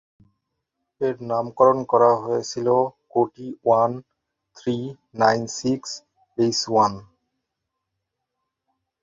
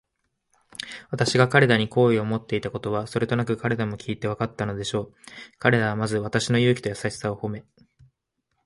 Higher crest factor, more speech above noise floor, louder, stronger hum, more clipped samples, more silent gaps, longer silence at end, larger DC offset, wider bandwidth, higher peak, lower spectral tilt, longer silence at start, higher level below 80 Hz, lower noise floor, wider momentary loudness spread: about the same, 22 dB vs 22 dB; first, 60 dB vs 53 dB; about the same, -22 LUFS vs -24 LUFS; neither; neither; neither; first, 2 s vs 1.05 s; neither; second, 7.8 kHz vs 11.5 kHz; about the same, -2 dBFS vs -2 dBFS; about the same, -5 dB/octave vs -5.5 dB/octave; first, 1 s vs 0.8 s; second, -64 dBFS vs -56 dBFS; first, -81 dBFS vs -77 dBFS; about the same, 14 LU vs 16 LU